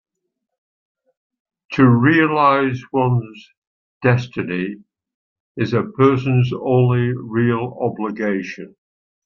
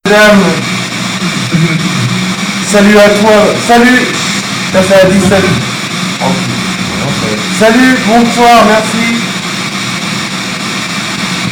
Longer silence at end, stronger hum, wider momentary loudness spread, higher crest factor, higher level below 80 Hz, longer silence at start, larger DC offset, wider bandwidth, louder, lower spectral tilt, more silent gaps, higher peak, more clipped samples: first, 0.6 s vs 0 s; neither; first, 12 LU vs 9 LU; first, 18 dB vs 8 dB; second, -58 dBFS vs -38 dBFS; first, 1.7 s vs 0.05 s; neither; second, 6.6 kHz vs 18.5 kHz; second, -18 LUFS vs -8 LUFS; first, -8.5 dB/octave vs -4 dB/octave; first, 3.57-4.01 s, 5.14-5.55 s vs none; about the same, -2 dBFS vs 0 dBFS; neither